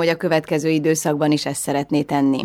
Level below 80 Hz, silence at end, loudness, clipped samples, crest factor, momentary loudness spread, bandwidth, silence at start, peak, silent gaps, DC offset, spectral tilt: -60 dBFS; 0 s; -20 LUFS; under 0.1%; 14 dB; 3 LU; 16 kHz; 0 s; -4 dBFS; none; under 0.1%; -5 dB/octave